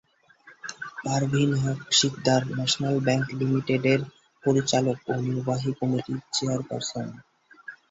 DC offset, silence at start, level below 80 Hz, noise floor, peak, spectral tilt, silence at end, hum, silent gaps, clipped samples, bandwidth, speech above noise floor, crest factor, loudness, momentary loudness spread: under 0.1%; 0.45 s; -60 dBFS; -55 dBFS; -8 dBFS; -4.5 dB/octave; 0.15 s; none; none; under 0.1%; 8 kHz; 30 dB; 18 dB; -25 LUFS; 15 LU